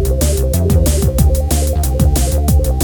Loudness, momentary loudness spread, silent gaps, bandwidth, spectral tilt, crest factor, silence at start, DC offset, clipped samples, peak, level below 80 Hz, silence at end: -14 LUFS; 2 LU; none; 19.5 kHz; -6 dB/octave; 12 dB; 0 s; under 0.1%; under 0.1%; 0 dBFS; -14 dBFS; 0 s